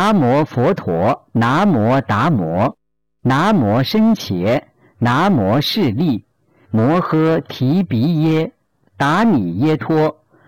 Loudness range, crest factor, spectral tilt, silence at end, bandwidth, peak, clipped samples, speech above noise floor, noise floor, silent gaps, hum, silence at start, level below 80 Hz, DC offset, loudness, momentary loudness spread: 1 LU; 6 dB; -7.5 dB/octave; 0.35 s; 17 kHz; -8 dBFS; under 0.1%; 22 dB; -37 dBFS; none; none; 0 s; -50 dBFS; 0.4%; -16 LUFS; 6 LU